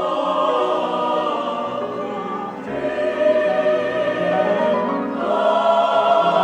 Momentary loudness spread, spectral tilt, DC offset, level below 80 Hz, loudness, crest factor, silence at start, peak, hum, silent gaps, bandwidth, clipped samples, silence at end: 9 LU; -6 dB/octave; under 0.1%; -60 dBFS; -19 LUFS; 14 dB; 0 s; -4 dBFS; none; none; 9 kHz; under 0.1%; 0 s